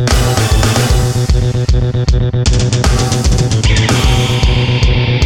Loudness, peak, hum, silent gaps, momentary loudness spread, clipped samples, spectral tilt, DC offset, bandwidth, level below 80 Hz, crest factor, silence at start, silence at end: -12 LUFS; 0 dBFS; none; none; 2 LU; under 0.1%; -5 dB/octave; under 0.1%; 17 kHz; -16 dBFS; 10 dB; 0 s; 0 s